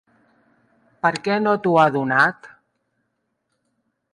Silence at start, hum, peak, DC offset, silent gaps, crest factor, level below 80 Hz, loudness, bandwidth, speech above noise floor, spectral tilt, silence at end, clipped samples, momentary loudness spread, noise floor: 1.05 s; none; -4 dBFS; under 0.1%; none; 20 dB; -68 dBFS; -19 LUFS; 11 kHz; 56 dB; -6 dB/octave; 1.65 s; under 0.1%; 6 LU; -74 dBFS